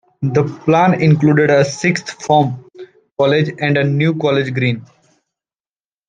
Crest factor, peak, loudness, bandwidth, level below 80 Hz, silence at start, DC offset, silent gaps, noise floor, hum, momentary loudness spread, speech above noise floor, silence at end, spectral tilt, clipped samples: 14 dB; -2 dBFS; -15 LUFS; 9.2 kHz; -56 dBFS; 0.2 s; under 0.1%; 3.12-3.16 s; under -90 dBFS; none; 8 LU; over 76 dB; 1.25 s; -6.5 dB/octave; under 0.1%